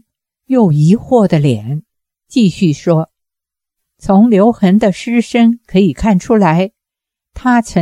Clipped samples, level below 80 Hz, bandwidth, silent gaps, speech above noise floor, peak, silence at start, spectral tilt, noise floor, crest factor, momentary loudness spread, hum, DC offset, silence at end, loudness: under 0.1%; -40 dBFS; 11 kHz; none; 72 dB; 0 dBFS; 0.5 s; -7.5 dB/octave; -83 dBFS; 12 dB; 9 LU; none; under 0.1%; 0 s; -12 LUFS